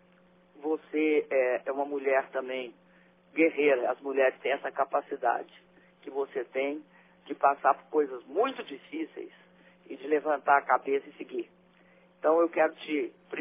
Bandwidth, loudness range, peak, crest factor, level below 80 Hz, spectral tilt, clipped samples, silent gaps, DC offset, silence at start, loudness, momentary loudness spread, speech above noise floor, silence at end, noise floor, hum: 3.8 kHz; 3 LU; -10 dBFS; 20 dB; -88 dBFS; -7.5 dB/octave; under 0.1%; none; under 0.1%; 0.6 s; -29 LUFS; 15 LU; 33 dB; 0 s; -61 dBFS; none